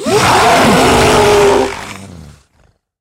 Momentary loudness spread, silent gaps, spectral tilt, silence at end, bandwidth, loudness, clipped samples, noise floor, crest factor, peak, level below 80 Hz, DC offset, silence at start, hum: 17 LU; none; -4 dB/octave; 0.7 s; 16 kHz; -9 LUFS; under 0.1%; -53 dBFS; 10 dB; 0 dBFS; -32 dBFS; under 0.1%; 0 s; none